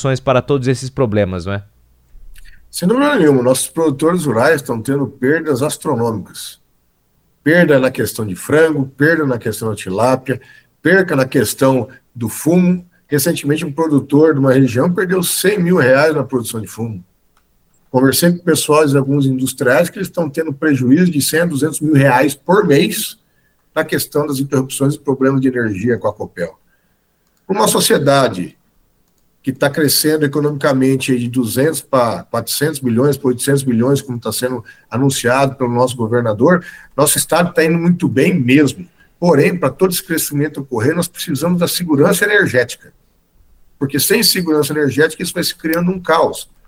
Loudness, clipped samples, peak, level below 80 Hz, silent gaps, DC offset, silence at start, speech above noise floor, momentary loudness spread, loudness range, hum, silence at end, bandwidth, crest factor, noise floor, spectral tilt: -15 LUFS; under 0.1%; 0 dBFS; -50 dBFS; none; under 0.1%; 0 s; 46 dB; 10 LU; 3 LU; none; 0.25 s; 16.5 kHz; 14 dB; -60 dBFS; -5 dB/octave